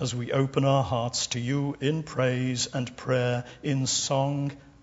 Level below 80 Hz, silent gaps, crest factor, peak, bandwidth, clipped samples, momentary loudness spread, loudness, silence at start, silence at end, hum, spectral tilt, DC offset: -58 dBFS; none; 18 dB; -10 dBFS; 8 kHz; under 0.1%; 6 LU; -27 LUFS; 0 s; 0.15 s; none; -4.5 dB/octave; under 0.1%